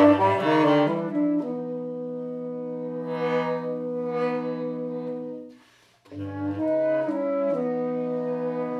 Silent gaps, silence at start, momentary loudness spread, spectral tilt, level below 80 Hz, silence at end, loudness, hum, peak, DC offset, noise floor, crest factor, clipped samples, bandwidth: none; 0 s; 12 LU; -8 dB/octave; -80 dBFS; 0 s; -26 LUFS; none; -8 dBFS; under 0.1%; -57 dBFS; 18 dB; under 0.1%; 7 kHz